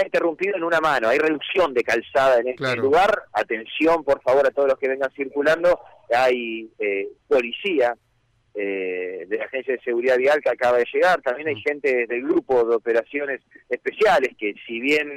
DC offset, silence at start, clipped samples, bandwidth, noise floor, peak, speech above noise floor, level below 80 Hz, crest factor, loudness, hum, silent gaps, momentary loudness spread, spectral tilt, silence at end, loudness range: under 0.1%; 0 s; under 0.1%; 15.5 kHz; -64 dBFS; -12 dBFS; 43 dB; -58 dBFS; 10 dB; -21 LUFS; none; none; 9 LU; -4.5 dB/octave; 0 s; 4 LU